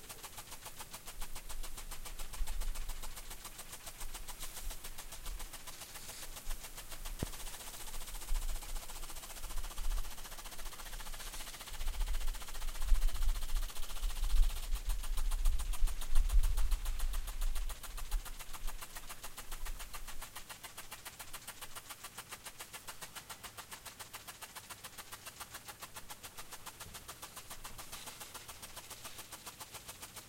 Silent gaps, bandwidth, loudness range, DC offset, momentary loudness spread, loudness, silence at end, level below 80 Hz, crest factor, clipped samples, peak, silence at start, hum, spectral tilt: none; 16.5 kHz; 8 LU; under 0.1%; 9 LU; -45 LUFS; 0 s; -38 dBFS; 22 dB; under 0.1%; -14 dBFS; 0 s; none; -2.5 dB/octave